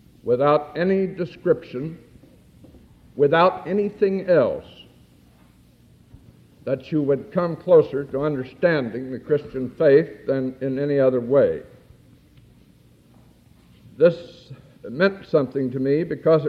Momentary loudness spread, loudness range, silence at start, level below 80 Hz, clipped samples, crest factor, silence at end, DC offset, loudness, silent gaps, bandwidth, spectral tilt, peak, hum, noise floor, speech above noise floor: 15 LU; 5 LU; 0.25 s; -58 dBFS; under 0.1%; 18 dB; 0 s; under 0.1%; -21 LUFS; none; 5.8 kHz; -9 dB/octave; -4 dBFS; none; -53 dBFS; 33 dB